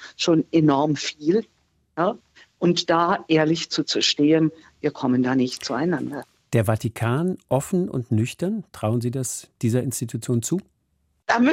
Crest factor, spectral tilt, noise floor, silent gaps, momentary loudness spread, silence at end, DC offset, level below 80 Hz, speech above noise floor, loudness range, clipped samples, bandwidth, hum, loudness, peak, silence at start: 18 dB; -5 dB/octave; -69 dBFS; none; 9 LU; 0 s; under 0.1%; -62 dBFS; 47 dB; 4 LU; under 0.1%; 16 kHz; none; -23 LUFS; -6 dBFS; 0 s